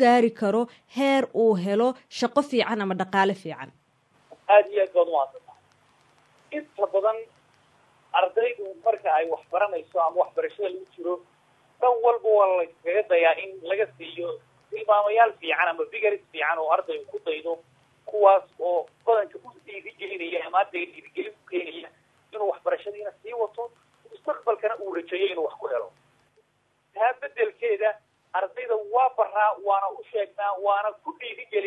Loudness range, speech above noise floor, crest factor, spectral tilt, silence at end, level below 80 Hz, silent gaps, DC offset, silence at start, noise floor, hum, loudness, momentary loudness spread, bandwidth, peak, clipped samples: 7 LU; 44 dB; 20 dB; -5.5 dB/octave; 0 s; -84 dBFS; none; under 0.1%; 0 s; -69 dBFS; none; -25 LUFS; 15 LU; 12 kHz; -4 dBFS; under 0.1%